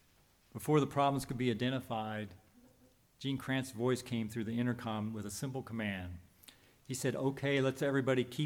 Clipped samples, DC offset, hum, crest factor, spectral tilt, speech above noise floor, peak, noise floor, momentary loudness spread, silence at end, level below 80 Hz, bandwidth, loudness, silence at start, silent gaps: under 0.1%; under 0.1%; none; 18 dB; -5.5 dB/octave; 33 dB; -18 dBFS; -68 dBFS; 12 LU; 0 s; -70 dBFS; 19.5 kHz; -36 LUFS; 0.55 s; none